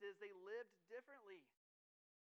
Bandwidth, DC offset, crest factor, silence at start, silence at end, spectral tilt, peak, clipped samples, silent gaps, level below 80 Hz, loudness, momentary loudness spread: 7 kHz; under 0.1%; 18 dB; 0 s; 0.9 s; -1 dB/octave; -42 dBFS; under 0.1%; none; under -90 dBFS; -58 LUFS; 10 LU